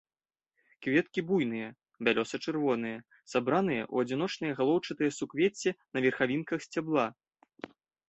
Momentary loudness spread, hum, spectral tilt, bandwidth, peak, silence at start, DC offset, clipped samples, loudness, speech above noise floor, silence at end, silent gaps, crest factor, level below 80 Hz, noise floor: 10 LU; none; -5.5 dB/octave; 8.2 kHz; -12 dBFS; 0.8 s; under 0.1%; under 0.1%; -31 LUFS; 49 dB; 0.4 s; none; 20 dB; -72 dBFS; -79 dBFS